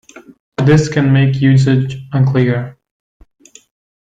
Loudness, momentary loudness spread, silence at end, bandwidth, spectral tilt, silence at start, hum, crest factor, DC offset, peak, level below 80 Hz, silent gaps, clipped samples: -13 LUFS; 9 LU; 1.3 s; 7.8 kHz; -7.5 dB/octave; 0.15 s; none; 12 dB; under 0.1%; -2 dBFS; -44 dBFS; 0.40-0.52 s; under 0.1%